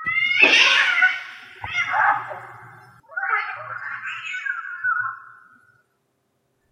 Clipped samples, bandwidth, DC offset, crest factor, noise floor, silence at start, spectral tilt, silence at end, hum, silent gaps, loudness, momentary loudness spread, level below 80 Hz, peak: under 0.1%; 11.5 kHz; under 0.1%; 22 dB; -70 dBFS; 0 s; -0.5 dB/octave; 1.4 s; none; none; -19 LUFS; 22 LU; -66 dBFS; -2 dBFS